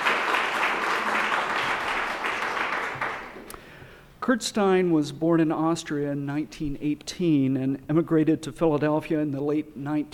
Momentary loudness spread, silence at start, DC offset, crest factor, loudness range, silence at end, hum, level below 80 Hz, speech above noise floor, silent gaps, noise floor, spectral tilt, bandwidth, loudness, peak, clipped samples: 8 LU; 0 s; under 0.1%; 16 dB; 2 LU; 0 s; none; -54 dBFS; 23 dB; none; -47 dBFS; -5.5 dB/octave; 15 kHz; -25 LUFS; -8 dBFS; under 0.1%